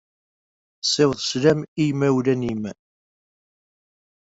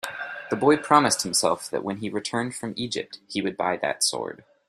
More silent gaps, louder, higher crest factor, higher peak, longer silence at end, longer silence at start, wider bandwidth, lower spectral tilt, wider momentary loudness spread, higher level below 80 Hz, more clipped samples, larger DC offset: first, 1.68-1.76 s vs none; first, -21 LUFS vs -24 LUFS; about the same, 20 dB vs 22 dB; about the same, -4 dBFS vs -2 dBFS; first, 1.6 s vs 0.35 s; first, 0.85 s vs 0.05 s; second, 8.2 kHz vs 15 kHz; first, -5 dB/octave vs -3 dB/octave; second, 8 LU vs 13 LU; first, -58 dBFS vs -66 dBFS; neither; neither